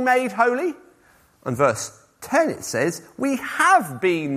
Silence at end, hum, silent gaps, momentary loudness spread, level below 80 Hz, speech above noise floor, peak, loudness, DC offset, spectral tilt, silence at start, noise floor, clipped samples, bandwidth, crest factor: 0 s; none; none; 15 LU; -64 dBFS; 35 dB; -4 dBFS; -21 LUFS; under 0.1%; -4.5 dB/octave; 0 s; -56 dBFS; under 0.1%; 15.5 kHz; 18 dB